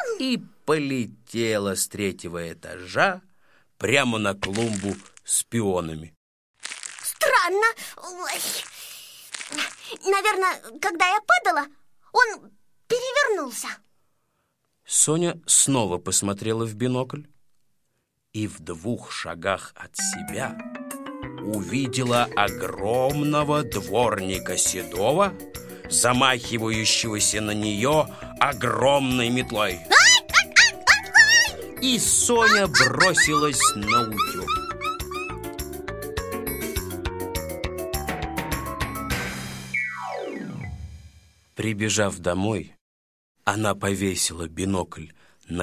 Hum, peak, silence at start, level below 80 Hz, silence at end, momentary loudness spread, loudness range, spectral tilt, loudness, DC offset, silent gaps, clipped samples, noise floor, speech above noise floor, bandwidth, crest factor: none; 0 dBFS; 0 s; -46 dBFS; 0 s; 17 LU; 13 LU; -2.5 dB/octave; -22 LUFS; under 0.1%; 6.16-6.54 s, 42.81-43.35 s; under 0.1%; -73 dBFS; 49 dB; 16 kHz; 24 dB